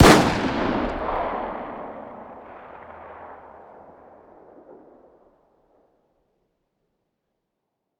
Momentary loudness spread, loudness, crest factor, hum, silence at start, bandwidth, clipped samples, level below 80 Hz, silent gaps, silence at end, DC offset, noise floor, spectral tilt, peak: 23 LU; -23 LUFS; 26 dB; none; 0 s; over 20 kHz; under 0.1%; -40 dBFS; none; 4.65 s; under 0.1%; -79 dBFS; -5 dB/octave; 0 dBFS